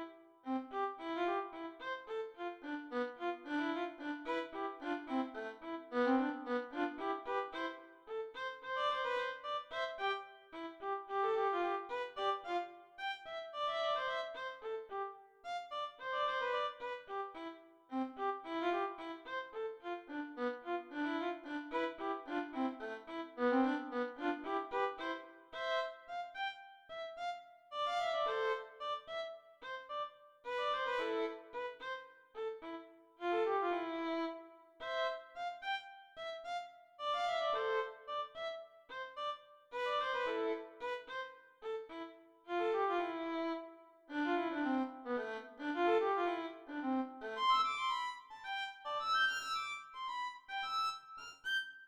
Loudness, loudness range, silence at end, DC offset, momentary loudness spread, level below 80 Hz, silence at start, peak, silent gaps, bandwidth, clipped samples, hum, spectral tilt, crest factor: -40 LUFS; 5 LU; 0 s; under 0.1%; 12 LU; -78 dBFS; 0 s; -22 dBFS; none; 15 kHz; under 0.1%; none; -3 dB/octave; 18 dB